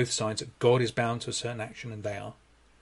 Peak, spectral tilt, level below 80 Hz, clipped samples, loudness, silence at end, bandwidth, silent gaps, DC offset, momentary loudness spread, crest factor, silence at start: -10 dBFS; -4.5 dB/octave; -62 dBFS; under 0.1%; -30 LUFS; 0.5 s; 11.5 kHz; none; under 0.1%; 13 LU; 20 dB; 0 s